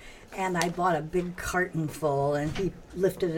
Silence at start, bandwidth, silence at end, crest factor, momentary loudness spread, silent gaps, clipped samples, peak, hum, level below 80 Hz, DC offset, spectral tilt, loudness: 0 s; 17 kHz; 0 s; 20 dB; 6 LU; none; under 0.1%; -10 dBFS; none; -48 dBFS; under 0.1%; -5.5 dB/octave; -29 LUFS